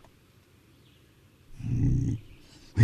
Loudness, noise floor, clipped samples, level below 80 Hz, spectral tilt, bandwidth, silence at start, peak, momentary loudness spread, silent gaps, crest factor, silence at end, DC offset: -30 LUFS; -59 dBFS; under 0.1%; -42 dBFS; -8 dB/octave; 9 kHz; 1.5 s; -8 dBFS; 25 LU; none; 22 dB; 0 s; under 0.1%